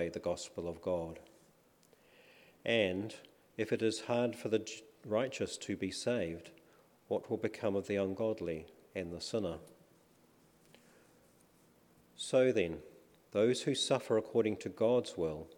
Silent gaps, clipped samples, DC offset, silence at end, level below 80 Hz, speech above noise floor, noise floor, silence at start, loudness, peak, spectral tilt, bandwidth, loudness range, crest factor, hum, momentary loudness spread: none; under 0.1%; under 0.1%; 0.05 s; -68 dBFS; 32 dB; -67 dBFS; 0 s; -36 LUFS; -16 dBFS; -5 dB/octave; 18 kHz; 8 LU; 20 dB; none; 13 LU